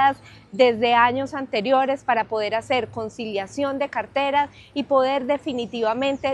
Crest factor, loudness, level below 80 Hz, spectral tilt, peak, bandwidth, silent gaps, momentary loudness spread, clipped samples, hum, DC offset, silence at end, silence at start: 18 dB; -22 LUFS; -60 dBFS; -5 dB/octave; -4 dBFS; 10 kHz; none; 10 LU; under 0.1%; none; under 0.1%; 0 s; 0 s